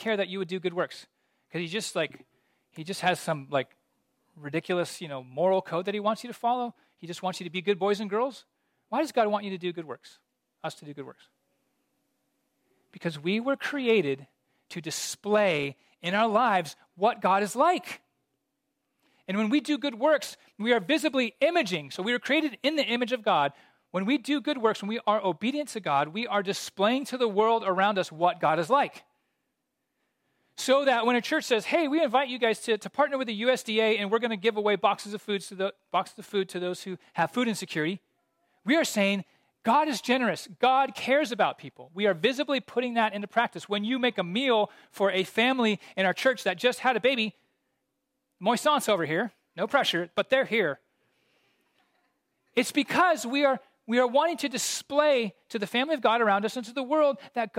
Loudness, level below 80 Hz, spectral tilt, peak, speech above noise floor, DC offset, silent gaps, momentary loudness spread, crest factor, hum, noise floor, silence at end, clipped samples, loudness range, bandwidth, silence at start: -27 LUFS; -82 dBFS; -4 dB/octave; -8 dBFS; 54 dB; under 0.1%; none; 11 LU; 20 dB; none; -81 dBFS; 0 s; under 0.1%; 6 LU; 16 kHz; 0 s